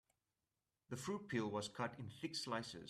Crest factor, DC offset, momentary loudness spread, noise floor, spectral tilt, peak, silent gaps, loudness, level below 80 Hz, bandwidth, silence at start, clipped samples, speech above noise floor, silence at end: 18 dB; under 0.1%; 7 LU; under -90 dBFS; -4.5 dB/octave; -28 dBFS; none; -45 LUFS; -78 dBFS; 14 kHz; 0.9 s; under 0.1%; over 45 dB; 0 s